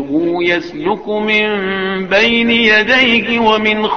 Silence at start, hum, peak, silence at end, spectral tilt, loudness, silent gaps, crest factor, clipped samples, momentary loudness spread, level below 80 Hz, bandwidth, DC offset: 0 s; none; 0 dBFS; 0 s; -5 dB/octave; -12 LUFS; none; 12 dB; under 0.1%; 8 LU; -46 dBFS; 6.8 kHz; 0.4%